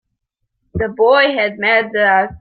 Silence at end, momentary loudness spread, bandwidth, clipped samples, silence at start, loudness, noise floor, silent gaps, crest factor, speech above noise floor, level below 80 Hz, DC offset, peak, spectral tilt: 0.05 s; 11 LU; 5 kHz; under 0.1%; 0.75 s; -14 LUFS; -73 dBFS; none; 14 dB; 59 dB; -44 dBFS; under 0.1%; -2 dBFS; -9 dB/octave